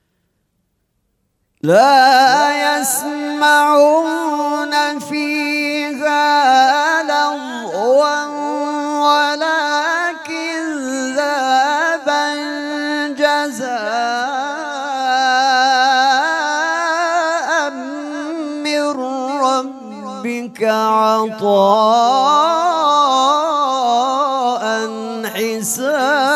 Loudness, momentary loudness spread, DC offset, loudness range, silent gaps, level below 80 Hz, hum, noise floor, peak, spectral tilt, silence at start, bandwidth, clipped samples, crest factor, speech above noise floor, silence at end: -15 LUFS; 10 LU; under 0.1%; 5 LU; none; -72 dBFS; none; -67 dBFS; 0 dBFS; -2.5 dB/octave; 1.65 s; 15.5 kHz; under 0.1%; 14 dB; 55 dB; 0 s